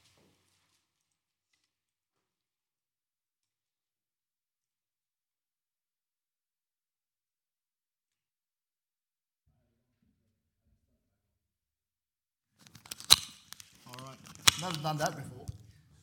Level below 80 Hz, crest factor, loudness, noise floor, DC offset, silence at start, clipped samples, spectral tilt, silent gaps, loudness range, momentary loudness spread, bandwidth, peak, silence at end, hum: -68 dBFS; 40 dB; -27 LUFS; under -90 dBFS; under 0.1%; 13 s; under 0.1%; -1 dB/octave; none; 2 LU; 26 LU; 17.5 kHz; 0 dBFS; 0.45 s; none